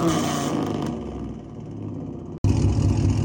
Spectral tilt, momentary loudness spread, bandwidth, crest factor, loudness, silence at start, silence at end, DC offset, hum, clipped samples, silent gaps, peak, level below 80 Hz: -6.5 dB/octave; 14 LU; 17 kHz; 16 dB; -25 LUFS; 0 s; 0 s; under 0.1%; none; under 0.1%; 2.38-2.44 s; -8 dBFS; -34 dBFS